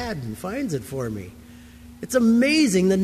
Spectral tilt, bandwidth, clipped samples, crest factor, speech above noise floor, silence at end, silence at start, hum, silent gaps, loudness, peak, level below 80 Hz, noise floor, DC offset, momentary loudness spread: -5 dB/octave; 15 kHz; under 0.1%; 14 dB; 23 dB; 0 s; 0 s; none; none; -22 LUFS; -8 dBFS; -48 dBFS; -44 dBFS; under 0.1%; 17 LU